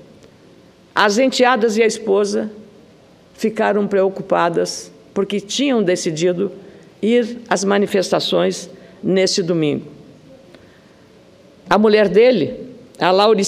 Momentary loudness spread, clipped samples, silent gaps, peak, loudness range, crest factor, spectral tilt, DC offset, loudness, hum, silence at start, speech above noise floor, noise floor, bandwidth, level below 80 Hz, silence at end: 12 LU; under 0.1%; none; 0 dBFS; 3 LU; 18 dB; -4.5 dB/octave; under 0.1%; -17 LUFS; none; 0.95 s; 31 dB; -47 dBFS; 14 kHz; -60 dBFS; 0 s